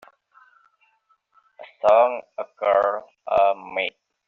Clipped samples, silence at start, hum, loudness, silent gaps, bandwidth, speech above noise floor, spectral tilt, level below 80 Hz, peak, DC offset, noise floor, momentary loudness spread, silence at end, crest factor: under 0.1%; 1.6 s; none; -21 LUFS; none; 6.8 kHz; 45 dB; -0.5 dB/octave; -66 dBFS; -4 dBFS; under 0.1%; -66 dBFS; 14 LU; 0.4 s; 20 dB